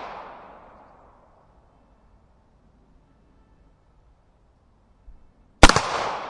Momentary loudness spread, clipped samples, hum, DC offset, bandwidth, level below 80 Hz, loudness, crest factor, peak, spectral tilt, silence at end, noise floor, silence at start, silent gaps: 30 LU; under 0.1%; none; under 0.1%; 11.5 kHz; -32 dBFS; -17 LUFS; 26 dB; 0 dBFS; -3.5 dB/octave; 0 s; -59 dBFS; 0 s; none